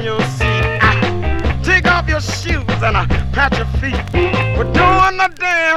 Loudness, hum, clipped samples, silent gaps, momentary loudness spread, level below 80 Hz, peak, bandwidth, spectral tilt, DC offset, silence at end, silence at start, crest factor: -15 LUFS; none; under 0.1%; none; 7 LU; -22 dBFS; 0 dBFS; 12.5 kHz; -5.5 dB/octave; under 0.1%; 0 s; 0 s; 14 dB